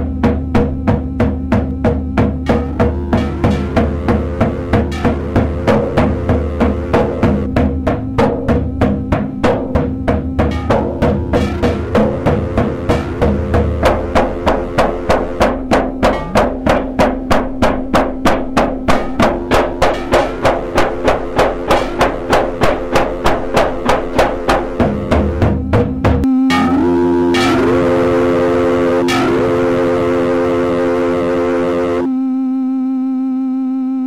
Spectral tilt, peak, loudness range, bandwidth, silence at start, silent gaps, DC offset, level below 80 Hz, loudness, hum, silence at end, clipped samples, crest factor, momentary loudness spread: -7 dB/octave; -2 dBFS; 3 LU; 15 kHz; 0 s; none; under 0.1%; -24 dBFS; -15 LUFS; none; 0 s; under 0.1%; 12 dB; 4 LU